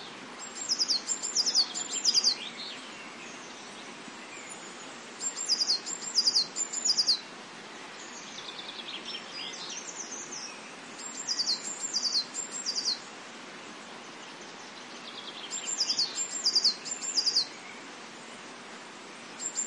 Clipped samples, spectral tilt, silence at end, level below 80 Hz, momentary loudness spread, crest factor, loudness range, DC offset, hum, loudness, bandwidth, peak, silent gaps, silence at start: under 0.1%; 1 dB/octave; 0 s; -86 dBFS; 19 LU; 20 dB; 9 LU; under 0.1%; none; -28 LUFS; 11.5 kHz; -14 dBFS; none; 0 s